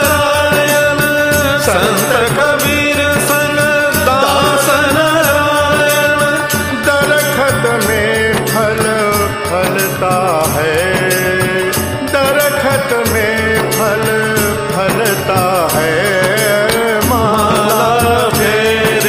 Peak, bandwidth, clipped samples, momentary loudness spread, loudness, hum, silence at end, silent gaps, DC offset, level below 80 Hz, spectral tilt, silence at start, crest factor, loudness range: 0 dBFS; 15.5 kHz; under 0.1%; 3 LU; -11 LUFS; none; 0 s; none; under 0.1%; -36 dBFS; -3.5 dB/octave; 0 s; 12 dB; 2 LU